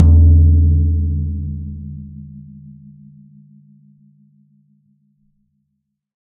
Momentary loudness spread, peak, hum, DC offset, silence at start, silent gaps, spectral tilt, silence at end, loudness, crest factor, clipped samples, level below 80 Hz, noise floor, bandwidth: 27 LU; 0 dBFS; none; under 0.1%; 0 s; none; -15 dB/octave; 3.85 s; -14 LUFS; 16 dB; under 0.1%; -24 dBFS; -73 dBFS; 1.1 kHz